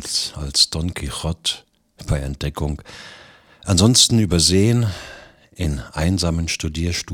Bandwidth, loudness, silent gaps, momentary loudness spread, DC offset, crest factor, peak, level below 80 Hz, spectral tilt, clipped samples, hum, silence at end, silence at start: 19 kHz; -19 LUFS; none; 19 LU; under 0.1%; 20 dB; 0 dBFS; -34 dBFS; -4 dB/octave; under 0.1%; none; 0 s; 0 s